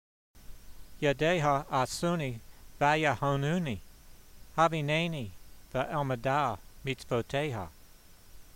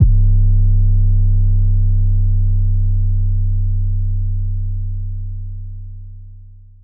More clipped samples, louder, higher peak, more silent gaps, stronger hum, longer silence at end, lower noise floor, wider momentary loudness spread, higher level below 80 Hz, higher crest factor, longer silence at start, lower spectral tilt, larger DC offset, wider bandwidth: neither; second, -31 LUFS vs -18 LUFS; second, -12 dBFS vs -2 dBFS; neither; neither; second, 0.1 s vs 0.4 s; first, -54 dBFS vs -38 dBFS; second, 12 LU vs 16 LU; second, -54 dBFS vs -16 dBFS; first, 20 dB vs 12 dB; first, 0.35 s vs 0 s; second, -5.5 dB/octave vs -15 dB/octave; neither; first, 16 kHz vs 0.7 kHz